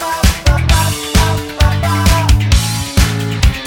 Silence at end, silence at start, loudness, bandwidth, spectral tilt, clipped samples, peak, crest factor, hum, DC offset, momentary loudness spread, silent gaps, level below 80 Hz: 0 s; 0 s; -13 LUFS; 18 kHz; -4.5 dB/octave; under 0.1%; 0 dBFS; 12 dB; none; under 0.1%; 3 LU; none; -16 dBFS